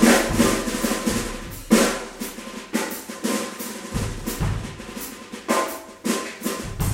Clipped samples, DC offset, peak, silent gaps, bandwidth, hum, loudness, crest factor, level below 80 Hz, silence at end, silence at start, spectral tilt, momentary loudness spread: under 0.1%; under 0.1%; -2 dBFS; none; 16 kHz; none; -24 LUFS; 22 dB; -38 dBFS; 0 s; 0 s; -4 dB/octave; 14 LU